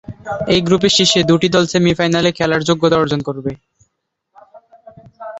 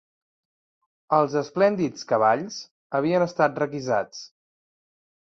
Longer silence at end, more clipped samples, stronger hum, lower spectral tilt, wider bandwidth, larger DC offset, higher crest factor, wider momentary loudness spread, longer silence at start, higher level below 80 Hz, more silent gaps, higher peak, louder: second, 0 s vs 0.95 s; neither; neither; second, -4.5 dB/octave vs -6 dB/octave; about the same, 8.2 kHz vs 7.6 kHz; neither; about the same, 16 dB vs 20 dB; about the same, 13 LU vs 12 LU; second, 0.1 s vs 1.1 s; first, -46 dBFS vs -68 dBFS; second, none vs 2.71-2.90 s; about the same, -2 dBFS vs -4 dBFS; first, -14 LUFS vs -23 LUFS